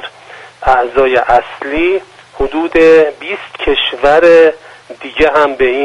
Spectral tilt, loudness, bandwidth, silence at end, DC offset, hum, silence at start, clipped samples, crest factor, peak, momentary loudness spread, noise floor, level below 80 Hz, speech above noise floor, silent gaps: -5 dB/octave; -10 LUFS; 9.8 kHz; 0 s; under 0.1%; none; 0 s; 0.2%; 12 dB; 0 dBFS; 15 LU; -35 dBFS; -34 dBFS; 25 dB; none